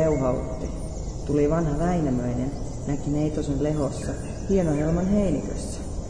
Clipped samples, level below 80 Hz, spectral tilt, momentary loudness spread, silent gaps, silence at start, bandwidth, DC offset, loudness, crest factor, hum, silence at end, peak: under 0.1%; -34 dBFS; -7.5 dB/octave; 10 LU; none; 0 s; 10.5 kHz; 0.7%; -26 LUFS; 14 dB; none; 0 s; -10 dBFS